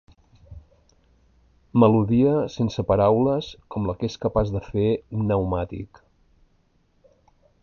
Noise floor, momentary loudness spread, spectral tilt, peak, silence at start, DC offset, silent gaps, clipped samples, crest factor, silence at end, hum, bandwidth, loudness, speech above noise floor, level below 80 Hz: -64 dBFS; 11 LU; -8.5 dB/octave; -4 dBFS; 0.5 s; under 0.1%; none; under 0.1%; 20 dB; 1.8 s; none; 7 kHz; -22 LUFS; 42 dB; -44 dBFS